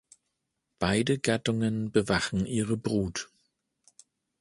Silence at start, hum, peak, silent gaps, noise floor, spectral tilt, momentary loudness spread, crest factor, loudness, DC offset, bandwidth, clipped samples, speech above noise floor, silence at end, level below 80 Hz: 0.8 s; none; -6 dBFS; none; -82 dBFS; -5 dB/octave; 7 LU; 24 dB; -28 LUFS; under 0.1%; 11.5 kHz; under 0.1%; 54 dB; 1.15 s; -52 dBFS